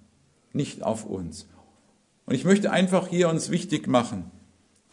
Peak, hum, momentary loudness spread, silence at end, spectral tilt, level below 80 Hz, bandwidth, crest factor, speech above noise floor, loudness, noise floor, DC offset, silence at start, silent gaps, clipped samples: -6 dBFS; none; 15 LU; 0.65 s; -5.5 dB/octave; -66 dBFS; 11 kHz; 20 dB; 39 dB; -25 LUFS; -64 dBFS; under 0.1%; 0.55 s; none; under 0.1%